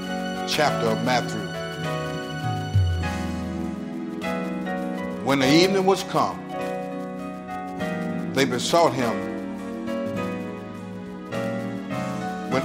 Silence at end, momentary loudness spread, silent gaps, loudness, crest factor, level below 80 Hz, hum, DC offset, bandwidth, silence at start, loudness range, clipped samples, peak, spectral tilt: 0 s; 12 LU; none; -25 LUFS; 22 dB; -48 dBFS; none; under 0.1%; 16 kHz; 0 s; 4 LU; under 0.1%; -4 dBFS; -5 dB/octave